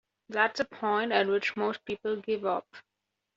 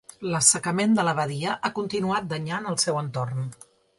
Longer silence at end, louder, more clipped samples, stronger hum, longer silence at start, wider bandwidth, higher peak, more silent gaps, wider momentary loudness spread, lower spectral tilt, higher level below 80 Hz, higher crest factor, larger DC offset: about the same, 0.55 s vs 0.45 s; second, -30 LUFS vs -24 LUFS; neither; neither; about the same, 0.3 s vs 0.2 s; second, 7.6 kHz vs 11.5 kHz; second, -10 dBFS vs -2 dBFS; neither; second, 8 LU vs 11 LU; second, -1.5 dB/octave vs -3.5 dB/octave; second, -74 dBFS vs -64 dBFS; about the same, 22 dB vs 22 dB; neither